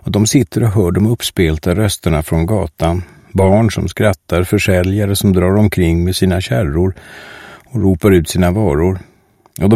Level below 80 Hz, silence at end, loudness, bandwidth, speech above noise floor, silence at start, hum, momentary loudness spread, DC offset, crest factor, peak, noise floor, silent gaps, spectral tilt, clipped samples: -30 dBFS; 0 s; -14 LUFS; 16 kHz; 26 dB; 0.05 s; none; 6 LU; 0.3%; 14 dB; 0 dBFS; -39 dBFS; none; -6 dB/octave; under 0.1%